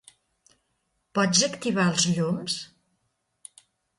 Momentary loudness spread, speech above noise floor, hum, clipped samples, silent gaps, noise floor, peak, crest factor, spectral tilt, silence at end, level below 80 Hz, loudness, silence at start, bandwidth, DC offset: 10 LU; 51 dB; none; under 0.1%; none; -75 dBFS; -8 dBFS; 22 dB; -3.5 dB/octave; 1.35 s; -66 dBFS; -24 LUFS; 1.15 s; 11.5 kHz; under 0.1%